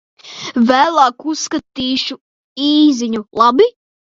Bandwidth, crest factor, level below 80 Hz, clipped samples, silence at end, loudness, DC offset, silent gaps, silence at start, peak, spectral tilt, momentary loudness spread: 7.6 kHz; 16 dB; -56 dBFS; under 0.1%; 0.45 s; -14 LUFS; under 0.1%; 2.21-2.56 s; 0.25 s; 0 dBFS; -3.5 dB/octave; 14 LU